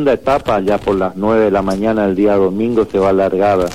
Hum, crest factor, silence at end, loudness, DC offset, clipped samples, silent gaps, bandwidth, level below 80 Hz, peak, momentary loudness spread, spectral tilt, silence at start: none; 12 dB; 0 s; -14 LUFS; 0.9%; under 0.1%; none; 15 kHz; -38 dBFS; -2 dBFS; 3 LU; -7 dB/octave; 0 s